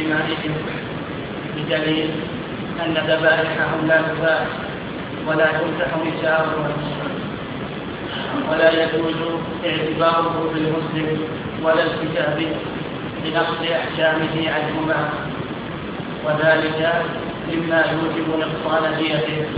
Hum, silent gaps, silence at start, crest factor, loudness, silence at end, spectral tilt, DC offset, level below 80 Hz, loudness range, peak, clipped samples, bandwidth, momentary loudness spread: none; none; 0 s; 20 dB; -21 LUFS; 0 s; -8.5 dB/octave; under 0.1%; -48 dBFS; 2 LU; -2 dBFS; under 0.1%; 5.2 kHz; 11 LU